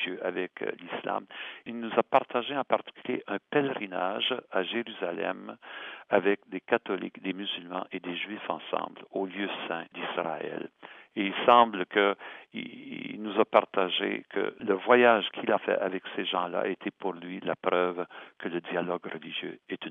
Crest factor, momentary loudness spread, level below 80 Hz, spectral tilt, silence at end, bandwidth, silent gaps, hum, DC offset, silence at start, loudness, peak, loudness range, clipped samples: 26 dB; 14 LU; -86 dBFS; -7 dB/octave; 0 s; 4 kHz; none; none; under 0.1%; 0 s; -29 LUFS; -4 dBFS; 7 LU; under 0.1%